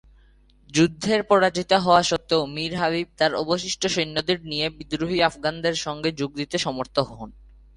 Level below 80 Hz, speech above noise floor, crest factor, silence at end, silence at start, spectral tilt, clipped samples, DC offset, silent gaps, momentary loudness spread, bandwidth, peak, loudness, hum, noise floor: -52 dBFS; 32 dB; 20 dB; 0.45 s; 0.7 s; -4 dB/octave; under 0.1%; under 0.1%; none; 8 LU; 11.5 kHz; -2 dBFS; -23 LUFS; none; -55 dBFS